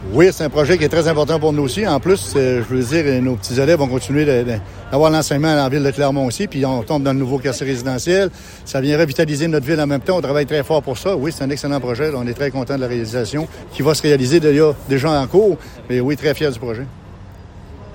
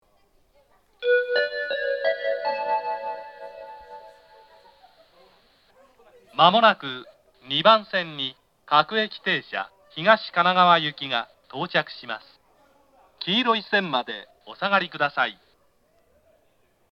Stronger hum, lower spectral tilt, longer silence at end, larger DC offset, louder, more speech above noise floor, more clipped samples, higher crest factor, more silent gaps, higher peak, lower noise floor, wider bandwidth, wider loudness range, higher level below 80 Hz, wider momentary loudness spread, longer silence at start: neither; about the same, -6 dB/octave vs -5.5 dB/octave; second, 0 s vs 1.6 s; neither; first, -17 LUFS vs -23 LUFS; second, 20 dB vs 43 dB; neither; second, 16 dB vs 26 dB; neither; about the same, 0 dBFS vs 0 dBFS; second, -36 dBFS vs -65 dBFS; first, 17 kHz vs 6.8 kHz; second, 3 LU vs 8 LU; first, -40 dBFS vs -72 dBFS; second, 8 LU vs 19 LU; second, 0 s vs 1 s